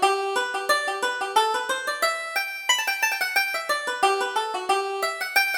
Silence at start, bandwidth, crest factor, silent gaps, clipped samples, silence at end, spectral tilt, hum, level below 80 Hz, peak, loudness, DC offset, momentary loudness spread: 0 s; over 20 kHz; 18 dB; none; under 0.1%; 0 s; 1 dB/octave; none; -70 dBFS; -6 dBFS; -23 LUFS; under 0.1%; 4 LU